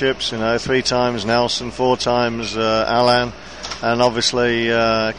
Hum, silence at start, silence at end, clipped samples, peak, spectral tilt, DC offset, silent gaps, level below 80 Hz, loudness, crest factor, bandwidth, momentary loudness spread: none; 0 s; 0 s; under 0.1%; -2 dBFS; -4 dB/octave; 0.6%; none; -44 dBFS; -18 LUFS; 16 dB; 11 kHz; 5 LU